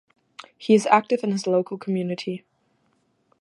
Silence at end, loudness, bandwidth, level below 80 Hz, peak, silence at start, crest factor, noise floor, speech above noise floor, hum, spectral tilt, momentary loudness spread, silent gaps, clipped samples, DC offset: 1.05 s; -23 LUFS; 11.5 kHz; -76 dBFS; -2 dBFS; 0.4 s; 22 dB; -68 dBFS; 46 dB; none; -6 dB/octave; 16 LU; none; under 0.1%; under 0.1%